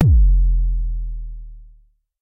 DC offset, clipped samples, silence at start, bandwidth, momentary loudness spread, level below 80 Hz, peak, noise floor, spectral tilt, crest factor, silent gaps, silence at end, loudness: under 0.1%; under 0.1%; 0 s; 0.9 kHz; 21 LU; -18 dBFS; -2 dBFS; -52 dBFS; -10.5 dB/octave; 16 dB; none; 0.6 s; -20 LUFS